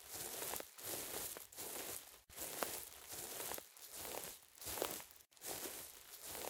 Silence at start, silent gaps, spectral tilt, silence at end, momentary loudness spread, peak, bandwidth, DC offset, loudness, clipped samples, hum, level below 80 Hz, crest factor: 0 s; none; -1 dB/octave; 0 s; 8 LU; -16 dBFS; 18 kHz; under 0.1%; -46 LUFS; under 0.1%; none; -74 dBFS; 32 dB